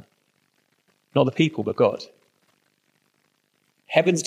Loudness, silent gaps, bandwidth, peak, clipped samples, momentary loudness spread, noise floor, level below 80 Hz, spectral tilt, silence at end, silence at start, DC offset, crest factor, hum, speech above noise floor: -23 LUFS; none; 13 kHz; -2 dBFS; under 0.1%; 11 LU; -69 dBFS; -76 dBFS; -5.5 dB/octave; 0 s; 1.15 s; under 0.1%; 24 dB; none; 48 dB